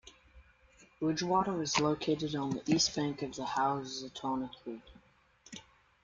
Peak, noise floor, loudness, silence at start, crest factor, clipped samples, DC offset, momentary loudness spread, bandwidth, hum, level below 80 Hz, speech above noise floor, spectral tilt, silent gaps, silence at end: -14 dBFS; -65 dBFS; -33 LUFS; 0.05 s; 22 dB; under 0.1%; under 0.1%; 19 LU; 9.4 kHz; none; -64 dBFS; 31 dB; -4 dB/octave; none; 0.45 s